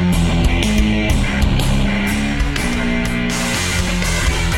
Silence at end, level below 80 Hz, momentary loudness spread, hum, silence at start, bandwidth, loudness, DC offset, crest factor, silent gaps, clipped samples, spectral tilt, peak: 0 s; -20 dBFS; 3 LU; none; 0 s; 17 kHz; -17 LUFS; under 0.1%; 14 dB; none; under 0.1%; -4.5 dB/octave; -2 dBFS